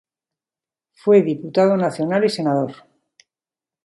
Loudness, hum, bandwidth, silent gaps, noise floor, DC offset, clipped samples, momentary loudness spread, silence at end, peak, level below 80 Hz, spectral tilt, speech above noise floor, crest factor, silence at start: -18 LUFS; none; 11.5 kHz; none; under -90 dBFS; under 0.1%; under 0.1%; 8 LU; 1.1 s; -4 dBFS; -70 dBFS; -7 dB/octave; over 73 dB; 18 dB; 1.05 s